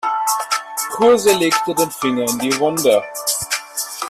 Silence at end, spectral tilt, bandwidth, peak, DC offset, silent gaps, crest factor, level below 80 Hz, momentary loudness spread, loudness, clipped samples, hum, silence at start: 0 s; -2.5 dB/octave; 16 kHz; 0 dBFS; under 0.1%; none; 16 dB; -58 dBFS; 8 LU; -17 LUFS; under 0.1%; none; 0.05 s